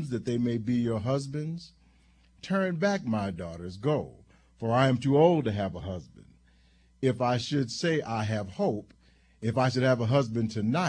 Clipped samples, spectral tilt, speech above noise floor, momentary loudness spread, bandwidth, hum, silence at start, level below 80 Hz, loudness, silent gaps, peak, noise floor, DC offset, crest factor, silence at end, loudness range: under 0.1%; -6.5 dB/octave; 34 dB; 14 LU; 10 kHz; none; 0 s; -58 dBFS; -28 LUFS; none; -10 dBFS; -61 dBFS; under 0.1%; 20 dB; 0 s; 4 LU